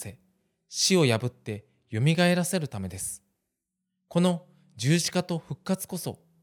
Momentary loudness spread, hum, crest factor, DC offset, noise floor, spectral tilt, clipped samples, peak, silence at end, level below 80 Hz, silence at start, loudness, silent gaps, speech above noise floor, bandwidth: 16 LU; none; 20 dB; under 0.1%; -83 dBFS; -4.5 dB/octave; under 0.1%; -10 dBFS; 0.25 s; -68 dBFS; 0 s; -27 LUFS; none; 57 dB; 18.5 kHz